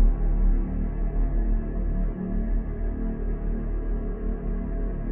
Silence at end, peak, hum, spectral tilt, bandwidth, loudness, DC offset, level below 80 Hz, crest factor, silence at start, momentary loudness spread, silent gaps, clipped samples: 0 s; -10 dBFS; none; -11.5 dB/octave; 2.4 kHz; -30 LUFS; under 0.1%; -24 dBFS; 14 dB; 0 s; 5 LU; none; under 0.1%